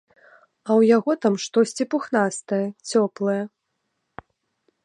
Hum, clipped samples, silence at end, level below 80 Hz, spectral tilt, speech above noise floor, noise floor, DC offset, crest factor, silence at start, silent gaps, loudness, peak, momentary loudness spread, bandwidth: none; under 0.1%; 1.35 s; -70 dBFS; -5 dB/octave; 55 dB; -76 dBFS; under 0.1%; 18 dB; 0.65 s; none; -22 LUFS; -6 dBFS; 9 LU; 11.5 kHz